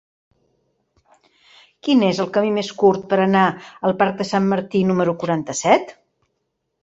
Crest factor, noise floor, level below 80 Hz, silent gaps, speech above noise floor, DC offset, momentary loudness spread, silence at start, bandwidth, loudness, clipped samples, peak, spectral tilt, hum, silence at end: 18 dB; -74 dBFS; -60 dBFS; none; 56 dB; under 0.1%; 6 LU; 1.85 s; 8 kHz; -19 LUFS; under 0.1%; -2 dBFS; -5.5 dB/octave; none; 0.9 s